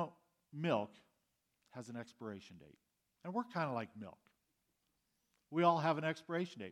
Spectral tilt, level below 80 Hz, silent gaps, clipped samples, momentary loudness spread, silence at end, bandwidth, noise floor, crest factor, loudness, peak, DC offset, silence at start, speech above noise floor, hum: -6.5 dB/octave; -86 dBFS; none; under 0.1%; 21 LU; 0 s; 12 kHz; -84 dBFS; 24 dB; -39 LUFS; -18 dBFS; under 0.1%; 0 s; 44 dB; none